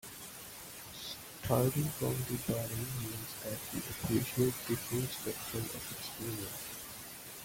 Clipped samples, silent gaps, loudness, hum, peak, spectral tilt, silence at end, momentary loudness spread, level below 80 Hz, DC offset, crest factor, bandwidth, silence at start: under 0.1%; none; -37 LUFS; none; -16 dBFS; -4.5 dB/octave; 0 s; 13 LU; -60 dBFS; under 0.1%; 22 dB; 17 kHz; 0.05 s